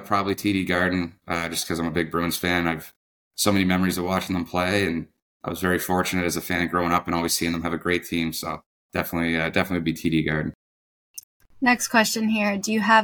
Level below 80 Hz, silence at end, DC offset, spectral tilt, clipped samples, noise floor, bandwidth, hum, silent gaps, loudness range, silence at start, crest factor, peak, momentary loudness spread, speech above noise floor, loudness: -50 dBFS; 0 s; under 0.1%; -4 dB/octave; under 0.1%; under -90 dBFS; 19.5 kHz; none; 2.96-3.31 s, 5.22-5.40 s, 8.66-8.89 s, 10.55-11.14 s, 11.24-11.40 s; 2 LU; 0 s; 20 dB; -4 dBFS; 11 LU; over 67 dB; -24 LUFS